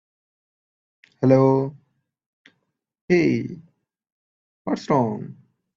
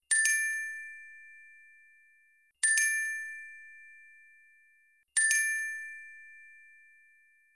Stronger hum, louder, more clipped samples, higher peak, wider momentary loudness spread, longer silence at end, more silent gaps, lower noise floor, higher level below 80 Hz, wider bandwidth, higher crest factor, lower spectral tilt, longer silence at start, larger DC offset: neither; first, -21 LUFS vs -28 LUFS; neither; first, -4 dBFS vs -12 dBFS; second, 19 LU vs 26 LU; second, 0.45 s vs 1.05 s; first, 2.26-2.45 s, 3.01-3.08 s, 4.12-4.65 s vs none; first, -74 dBFS vs -67 dBFS; first, -64 dBFS vs under -90 dBFS; second, 7.4 kHz vs 11.5 kHz; about the same, 20 dB vs 22 dB; first, -8 dB/octave vs 7.5 dB/octave; first, 1.2 s vs 0.1 s; neither